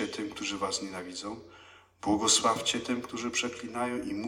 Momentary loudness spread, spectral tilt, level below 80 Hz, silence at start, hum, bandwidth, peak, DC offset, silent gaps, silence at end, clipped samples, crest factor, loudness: 15 LU; -2 dB/octave; -64 dBFS; 0 s; none; 16.5 kHz; -12 dBFS; under 0.1%; none; 0 s; under 0.1%; 20 dB; -30 LUFS